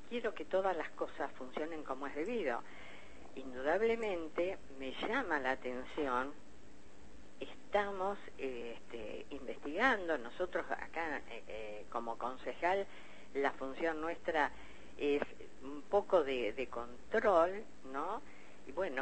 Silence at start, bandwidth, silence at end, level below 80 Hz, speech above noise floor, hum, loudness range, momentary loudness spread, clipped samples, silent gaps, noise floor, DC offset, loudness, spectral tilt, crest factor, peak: 0 s; 8.4 kHz; 0 s; -64 dBFS; 22 dB; none; 5 LU; 16 LU; under 0.1%; none; -60 dBFS; 0.5%; -38 LUFS; -5 dB/octave; 22 dB; -18 dBFS